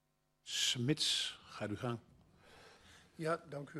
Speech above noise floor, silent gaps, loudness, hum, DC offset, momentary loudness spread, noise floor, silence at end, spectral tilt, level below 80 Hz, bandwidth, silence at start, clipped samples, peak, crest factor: 24 dB; none; -37 LUFS; none; under 0.1%; 12 LU; -63 dBFS; 0 s; -3 dB/octave; -74 dBFS; 13 kHz; 0.45 s; under 0.1%; -20 dBFS; 20 dB